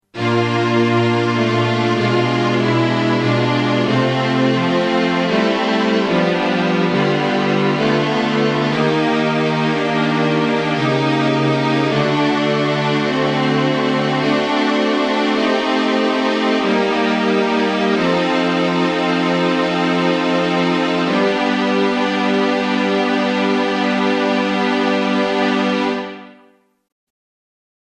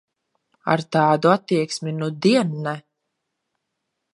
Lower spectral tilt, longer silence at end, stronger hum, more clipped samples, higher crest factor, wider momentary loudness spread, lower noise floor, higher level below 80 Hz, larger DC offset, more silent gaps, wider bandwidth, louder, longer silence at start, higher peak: about the same, -6 dB/octave vs -6 dB/octave; first, 1.5 s vs 1.35 s; neither; neither; second, 14 dB vs 20 dB; second, 1 LU vs 12 LU; second, -52 dBFS vs -78 dBFS; first, -56 dBFS vs -70 dBFS; neither; neither; second, 10 kHz vs 11.5 kHz; first, -16 LUFS vs -20 LUFS; second, 0.15 s vs 0.65 s; about the same, -4 dBFS vs -2 dBFS